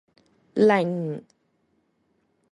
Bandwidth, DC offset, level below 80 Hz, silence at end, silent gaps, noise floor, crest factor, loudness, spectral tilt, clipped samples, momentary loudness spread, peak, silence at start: 10.5 kHz; under 0.1%; -68 dBFS; 1.3 s; none; -70 dBFS; 18 dB; -23 LUFS; -7.5 dB/octave; under 0.1%; 14 LU; -8 dBFS; 0.55 s